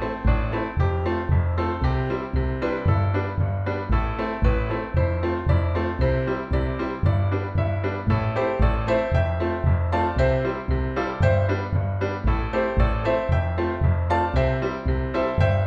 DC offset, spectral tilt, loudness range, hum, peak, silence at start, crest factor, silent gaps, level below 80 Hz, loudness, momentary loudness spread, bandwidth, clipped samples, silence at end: under 0.1%; -9 dB/octave; 1 LU; none; -6 dBFS; 0 s; 16 dB; none; -28 dBFS; -24 LUFS; 4 LU; 6.6 kHz; under 0.1%; 0 s